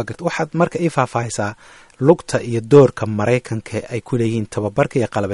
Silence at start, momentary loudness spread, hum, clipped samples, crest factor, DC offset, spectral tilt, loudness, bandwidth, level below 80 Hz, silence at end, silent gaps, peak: 0 s; 12 LU; none; under 0.1%; 18 dB; under 0.1%; -6.5 dB/octave; -18 LUFS; 11.5 kHz; -50 dBFS; 0 s; none; 0 dBFS